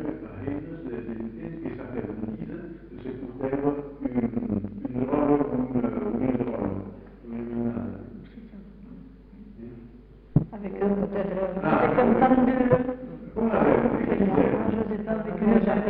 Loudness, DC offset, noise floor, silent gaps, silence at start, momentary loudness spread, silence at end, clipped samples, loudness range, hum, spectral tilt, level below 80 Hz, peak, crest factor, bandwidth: -26 LUFS; under 0.1%; -48 dBFS; none; 0 s; 22 LU; 0 s; under 0.1%; 12 LU; none; -8 dB/octave; -48 dBFS; -4 dBFS; 22 dB; 4.3 kHz